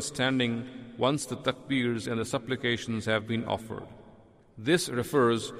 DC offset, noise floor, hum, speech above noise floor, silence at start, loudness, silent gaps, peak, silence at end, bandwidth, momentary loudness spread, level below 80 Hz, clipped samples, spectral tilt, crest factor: under 0.1%; -56 dBFS; none; 27 dB; 0 s; -29 LUFS; none; -12 dBFS; 0 s; 15.5 kHz; 10 LU; -62 dBFS; under 0.1%; -4.5 dB/octave; 18 dB